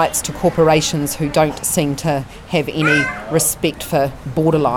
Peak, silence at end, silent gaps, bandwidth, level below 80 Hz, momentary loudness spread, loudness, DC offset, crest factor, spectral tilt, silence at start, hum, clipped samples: -2 dBFS; 0 s; none; 19 kHz; -40 dBFS; 7 LU; -17 LUFS; under 0.1%; 14 dB; -4 dB/octave; 0 s; none; under 0.1%